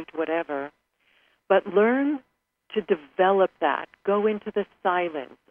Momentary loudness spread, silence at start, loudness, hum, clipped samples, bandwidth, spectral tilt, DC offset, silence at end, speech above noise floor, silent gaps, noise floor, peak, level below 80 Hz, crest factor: 11 LU; 0 s; -25 LUFS; none; under 0.1%; 3.6 kHz; -8.5 dB/octave; under 0.1%; 0.25 s; 41 dB; none; -66 dBFS; -6 dBFS; -72 dBFS; 18 dB